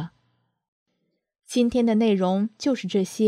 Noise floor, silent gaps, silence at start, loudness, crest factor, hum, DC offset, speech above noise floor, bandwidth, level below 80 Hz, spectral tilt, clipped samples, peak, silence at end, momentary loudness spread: -75 dBFS; 0.68-0.86 s; 0 s; -23 LUFS; 16 dB; none; under 0.1%; 54 dB; 14 kHz; -58 dBFS; -6 dB/octave; under 0.1%; -10 dBFS; 0 s; 6 LU